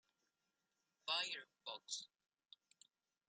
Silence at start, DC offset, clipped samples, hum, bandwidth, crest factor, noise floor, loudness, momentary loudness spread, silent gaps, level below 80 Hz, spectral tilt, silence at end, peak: 1.05 s; under 0.1%; under 0.1%; none; 11.5 kHz; 26 dB; -89 dBFS; -45 LUFS; 17 LU; none; under -90 dBFS; 1.5 dB/octave; 1.2 s; -26 dBFS